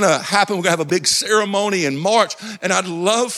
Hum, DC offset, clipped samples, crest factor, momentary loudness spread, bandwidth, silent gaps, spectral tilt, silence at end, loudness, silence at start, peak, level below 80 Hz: none; under 0.1%; under 0.1%; 16 dB; 4 LU; 15.5 kHz; none; -3 dB/octave; 0 s; -17 LUFS; 0 s; -2 dBFS; -66 dBFS